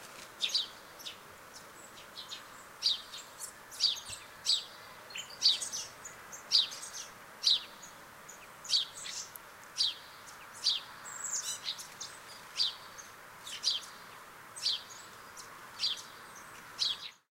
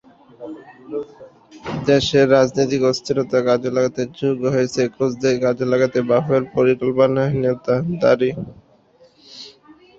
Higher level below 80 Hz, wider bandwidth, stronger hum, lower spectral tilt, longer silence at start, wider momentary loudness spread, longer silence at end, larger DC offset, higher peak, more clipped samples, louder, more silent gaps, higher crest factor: second, -74 dBFS vs -52 dBFS; first, 16 kHz vs 7.8 kHz; neither; second, 1.5 dB/octave vs -6 dB/octave; second, 0 s vs 0.4 s; about the same, 21 LU vs 20 LU; second, 0.15 s vs 0.5 s; neither; second, -12 dBFS vs -2 dBFS; neither; second, -33 LUFS vs -18 LUFS; neither; first, 26 dB vs 18 dB